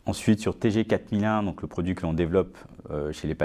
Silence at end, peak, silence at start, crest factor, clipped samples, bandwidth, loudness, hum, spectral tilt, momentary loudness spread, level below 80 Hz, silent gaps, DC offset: 0 s; -10 dBFS; 0.05 s; 18 dB; under 0.1%; 14.5 kHz; -27 LUFS; none; -7 dB/octave; 8 LU; -44 dBFS; none; under 0.1%